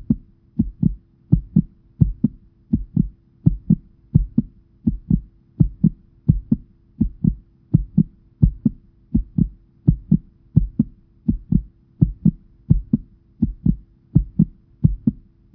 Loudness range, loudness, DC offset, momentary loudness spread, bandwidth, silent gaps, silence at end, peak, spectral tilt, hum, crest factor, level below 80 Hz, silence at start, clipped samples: 1 LU; -22 LUFS; under 0.1%; 7 LU; 1.1 kHz; none; 0.4 s; 0 dBFS; -16 dB/octave; none; 20 dB; -30 dBFS; 0 s; under 0.1%